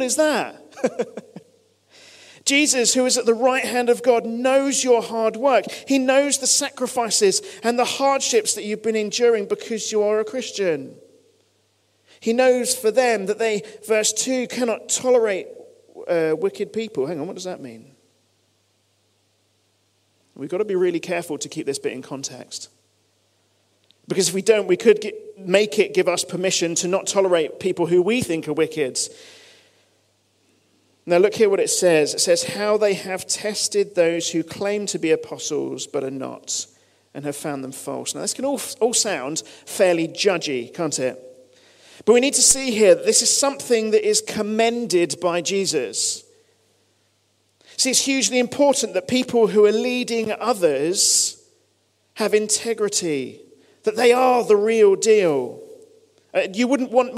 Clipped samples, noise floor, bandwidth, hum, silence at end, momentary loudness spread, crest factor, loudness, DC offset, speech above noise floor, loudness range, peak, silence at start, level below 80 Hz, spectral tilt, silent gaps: under 0.1%; -65 dBFS; 16 kHz; none; 0 s; 13 LU; 20 dB; -20 LUFS; under 0.1%; 45 dB; 9 LU; -2 dBFS; 0 s; -66 dBFS; -2.5 dB/octave; none